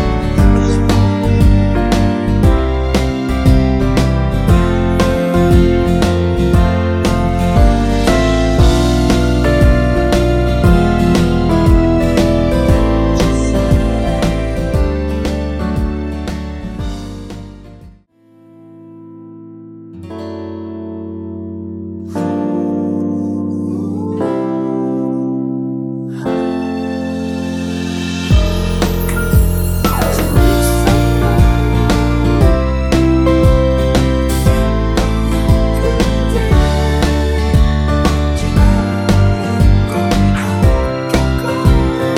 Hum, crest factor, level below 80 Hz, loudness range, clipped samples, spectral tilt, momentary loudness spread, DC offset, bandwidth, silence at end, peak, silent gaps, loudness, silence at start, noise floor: none; 12 dB; -18 dBFS; 12 LU; under 0.1%; -7 dB/octave; 12 LU; under 0.1%; 17.5 kHz; 0 s; 0 dBFS; none; -14 LUFS; 0 s; -47 dBFS